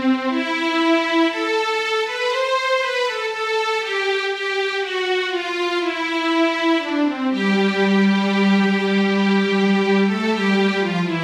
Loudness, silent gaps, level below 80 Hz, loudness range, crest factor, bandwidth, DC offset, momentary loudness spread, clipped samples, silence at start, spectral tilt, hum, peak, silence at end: -19 LUFS; none; -64 dBFS; 3 LU; 12 dB; 11 kHz; under 0.1%; 4 LU; under 0.1%; 0 s; -5.5 dB/octave; none; -6 dBFS; 0 s